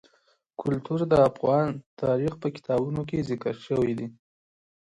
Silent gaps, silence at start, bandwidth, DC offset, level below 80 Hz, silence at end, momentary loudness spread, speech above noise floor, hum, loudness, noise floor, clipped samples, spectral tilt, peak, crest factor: 1.86-1.97 s; 0.6 s; 11 kHz; under 0.1%; -56 dBFS; 0.75 s; 12 LU; 41 dB; none; -26 LUFS; -67 dBFS; under 0.1%; -8.5 dB/octave; -8 dBFS; 20 dB